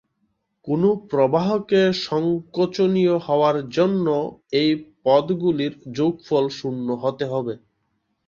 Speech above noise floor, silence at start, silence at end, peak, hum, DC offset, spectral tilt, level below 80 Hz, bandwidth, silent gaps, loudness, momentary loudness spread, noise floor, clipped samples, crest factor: 51 dB; 0.65 s; 0.7 s; -4 dBFS; none; under 0.1%; -7 dB/octave; -62 dBFS; 7.4 kHz; none; -21 LUFS; 7 LU; -72 dBFS; under 0.1%; 18 dB